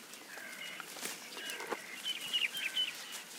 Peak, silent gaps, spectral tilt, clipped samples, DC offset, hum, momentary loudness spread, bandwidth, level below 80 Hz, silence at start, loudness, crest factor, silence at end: -20 dBFS; none; 0.5 dB/octave; under 0.1%; under 0.1%; none; 11 LU; 18 kHz; under -90 dBFS; 0 s; -38 LUFS; 20 dB; 0 s